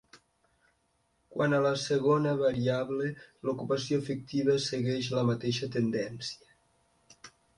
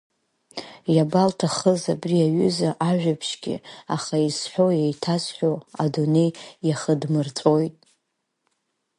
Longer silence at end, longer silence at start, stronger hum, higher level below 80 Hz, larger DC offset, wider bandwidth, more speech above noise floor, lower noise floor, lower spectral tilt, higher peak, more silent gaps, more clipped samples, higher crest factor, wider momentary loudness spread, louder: second, 0.3 s vs 1.3 s; second, 0.15 s vs 0.55 s; neither; about the same, -66 dBFS vs -66 dBFS; neither; about the same, 11.5 kHz vs 11.5 kHz; second, 44 dB vs 55 dB; second, -73 dBFS vs -77 dBFS; about the same, -6 dB/octave vs -6 dB/octave; second, -14 dBFS vs -4 dBFS; neither; neither; about the same, 18 dB vs 18 dB; about the same, 10 LU vs 10 LU; second, -30 LUFS vs -23 LUFS